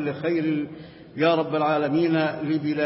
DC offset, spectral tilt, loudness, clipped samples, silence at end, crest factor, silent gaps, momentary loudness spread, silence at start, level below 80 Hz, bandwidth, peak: under 0.1%; -11 dB/octave; -23 LUFS; under 0.1%; 0 s; 14 dB; none; 11 LU; 0 s; -64 dBFS; 5.8 kHz; -10 dBFS